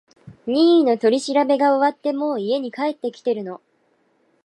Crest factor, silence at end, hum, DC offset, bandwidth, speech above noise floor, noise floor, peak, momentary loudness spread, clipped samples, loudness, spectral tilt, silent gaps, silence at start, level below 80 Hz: 14 dB; 0.9 s; none; under 0.1%; 11.5 kHz; 45 dB; -64 dBFS; -6 dBFS; 12 LU; under 0.1%; -19 LUFS; -5 dB/octave; none; 0.25 s; -72 dBFS